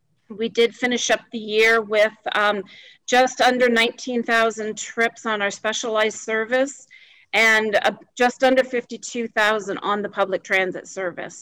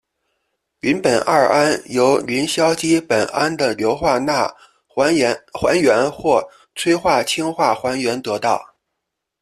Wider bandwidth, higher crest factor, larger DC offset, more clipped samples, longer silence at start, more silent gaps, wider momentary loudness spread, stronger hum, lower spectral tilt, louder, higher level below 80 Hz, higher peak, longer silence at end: first, over 20 kHz vs 14 kHz; about the same, 12 dB vs 16 dB; neither; neither; second, 0.3 s vs 0.85 s; neither; first, 12 LU vs 6 LU; neither; second, -2.5 dB/octave vs -4 dB/octave; second, -20 LUFS vs -17 LUFS; second, -64 dBFS vs -52 dBFS; second, -10 dBFS vs -2 dBFS; second, 0 s vs 0.75 s